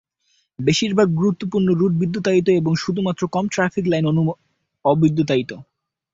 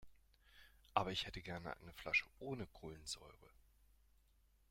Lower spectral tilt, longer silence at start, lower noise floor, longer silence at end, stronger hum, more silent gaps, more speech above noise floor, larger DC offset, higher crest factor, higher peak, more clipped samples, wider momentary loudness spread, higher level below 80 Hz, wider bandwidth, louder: first, -6.5 dB/octave vs -3.5 dB/octave; first, 0.6 s vs 0 s; second, -66 dBFS vs -74 dBFS; second, 0.5 s vs 1.2 s; neither; neither; first, 47 dB vs 29 dB; neither; second, 16 dB vs 30 dB; first, -4 dBFS vs -18 dBFS; neither; second, 7 LU vs 13 LU; first, -54 dBFS vs -66 dBFS; second, 7.8 kHz vs 16.5 kHz; first, -19 LUFS vs -44 LUFS